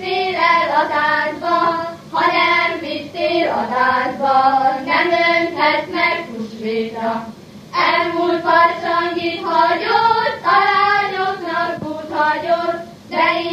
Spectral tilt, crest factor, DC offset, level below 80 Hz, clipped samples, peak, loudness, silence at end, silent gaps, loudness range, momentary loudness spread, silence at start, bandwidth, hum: -4.5 dB/octave; 16 dB; under 0.1%; -60 dBFS; under 0.1%; 0 dBFS; -16 LUFS; 0 s; none; 3 LU; 10 LU; 0 s; 15 kHz; none